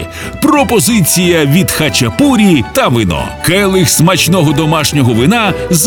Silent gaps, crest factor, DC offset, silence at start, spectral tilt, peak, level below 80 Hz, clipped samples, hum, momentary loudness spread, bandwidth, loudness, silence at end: none; 10 dB; 0.2%; 0 s; -4.5 dB/octave; 0 dBFS; -32 dBFS; under 0.1%; none; 4 LU; over 20 kHz; -9 LUFS; 0 s